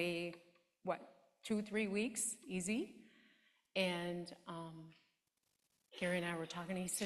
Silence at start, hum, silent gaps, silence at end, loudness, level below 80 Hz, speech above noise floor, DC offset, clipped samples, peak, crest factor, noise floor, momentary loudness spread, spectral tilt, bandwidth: 0 s; none; none; 0 s; -42 LUFS; -78 dBFS; 43 dB; under 0.1%; under 0.1%; -22 dBFS; 22 dB; -85 dBFS; 16 LU; -4 dB/octave; 14 kHz